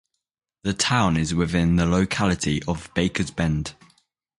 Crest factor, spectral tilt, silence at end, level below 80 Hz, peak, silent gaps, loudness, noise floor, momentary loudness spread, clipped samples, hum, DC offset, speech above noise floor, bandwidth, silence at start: 18 dB; -5 dB/octave; 0.65 s; -38 dBFS; -6 dBFS; none; -23 LUFS; -81 dBFS; 8 LU; under 0.1%; none; under 0.1%; 60 dB; 11.5 kHz; 0.65 s